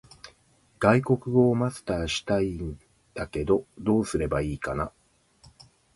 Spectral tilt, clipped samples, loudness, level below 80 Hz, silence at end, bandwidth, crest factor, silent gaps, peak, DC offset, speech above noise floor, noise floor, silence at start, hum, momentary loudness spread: -6.5 dB/octave; under 0.1%; -26 LUFS; -46 dBFS; 1.05 s; 11.5 kHz; 22 dB; none; -4 dBFS; under 0.1%; 38 dB; -63 dBFS; 0.25 s; none; 14 LU